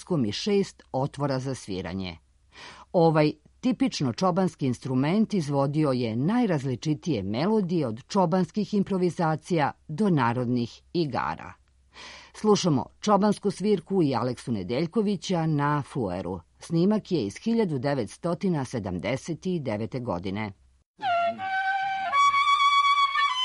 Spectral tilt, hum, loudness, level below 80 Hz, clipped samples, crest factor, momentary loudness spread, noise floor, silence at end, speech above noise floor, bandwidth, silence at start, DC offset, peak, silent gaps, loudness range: -6 dB/octave; none; -26 LUFS; -60 dBFS; under 0.1%; 18 dB; 10 LU; -49 dBFS; 0 s; 23 dB; 11.5 kHz; 0 s; under 0.1%; -8 dBFS; 20.86-20.94 s; 4 LU